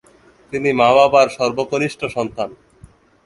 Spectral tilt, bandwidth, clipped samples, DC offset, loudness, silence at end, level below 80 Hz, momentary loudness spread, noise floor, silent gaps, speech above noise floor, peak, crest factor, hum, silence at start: -5 dB/octave; 11.5 kHz; under 0.1%; under 0.1%; -16 LUFS; 0.7 s; -52 dBFS; 15 LU; -47 dBFS; none; 31 dB; 0 dBFS; 18 dB; none; 0.5 s